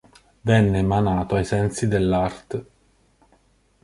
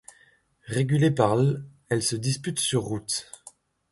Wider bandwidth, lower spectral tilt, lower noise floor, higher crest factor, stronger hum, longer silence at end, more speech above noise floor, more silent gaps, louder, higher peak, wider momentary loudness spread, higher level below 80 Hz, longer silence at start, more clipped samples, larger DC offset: about the same, 11.5 kHz vs 12 kHz; first, -7 dB/octave vs -5 dB/octave; about the same, -60 dBFS vs -61 dBFS; about the same, 20 dB vs 20 dB; neither; first, 1.2 s vs 0.7 s; about the same, 40 dB vs 37 dB; neither; first, -22 LUFS vs -25 LUFS; about the same, -4 dBFS vs -6 dBFS; first, 13 LU vs 10 LU; first, -40 dBFS vs -58 dBFS; second, 0.45 s vs 0.65 s; neither; neither